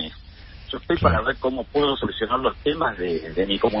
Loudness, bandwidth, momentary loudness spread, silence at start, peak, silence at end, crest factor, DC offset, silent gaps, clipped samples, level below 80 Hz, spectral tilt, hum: -23 LUFS; 5.8 kHz; 12 LU; 0 s; -4 dBFS; 0 s; 20 dB; under 0.1%; none; under 0.1%; -38 dBFS; -10.5 dB/octave; none